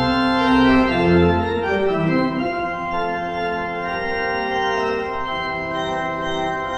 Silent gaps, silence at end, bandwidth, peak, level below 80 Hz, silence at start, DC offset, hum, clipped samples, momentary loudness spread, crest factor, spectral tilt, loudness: none; 0 s; 8.8 kHz; -4 dBFS; -40 dBFS; 0 s; under 0.1%; none; under 0.1%; 8 LU; 14 dB; -6.5 dB/octave; -20 LUFS